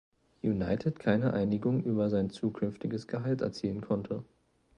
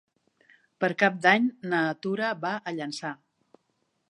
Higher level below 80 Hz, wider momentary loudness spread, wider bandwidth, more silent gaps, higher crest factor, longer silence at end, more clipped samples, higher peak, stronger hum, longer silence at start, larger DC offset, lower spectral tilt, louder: first, -58 dBFS vs -80 dBFS; second, 7 LU vs 13 LU; second, 9.2 kHz vs 11 kHz; neither; about the same, 20 dB vs 24 dB; second, 0.55 s vs 0.95 s; neither; second, -12 dBFS vs -6 dBFS; neither; second, 0.45 s vs 0.8 s; neither; first, -8.5 dB/octave vs -5.5 dB/octave; second, -32 LUFS vs -26 LUFS